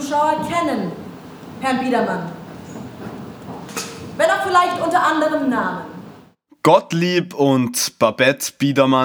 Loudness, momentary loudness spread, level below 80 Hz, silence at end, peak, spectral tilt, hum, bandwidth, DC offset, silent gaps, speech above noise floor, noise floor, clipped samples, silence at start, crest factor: -18 LUFS; 19 LU; -60 dBFS; 0 s; 0 dBFS; -4.5 dB/octave; none; over 20 kHz; under 0.1%; none; 31 dB; -48 dBFS; under 0.1%; 0 s; 18 dB